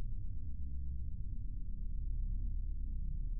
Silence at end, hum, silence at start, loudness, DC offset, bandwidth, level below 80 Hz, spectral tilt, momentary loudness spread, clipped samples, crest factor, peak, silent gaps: 0 s; none; 0 s; -45 LUFS; under 0.1%; 0.5 kHz; -40 dBFS; -18.5 dB/octave; 4 LU; under 0.1%; 10 dB; -28 dBFS; none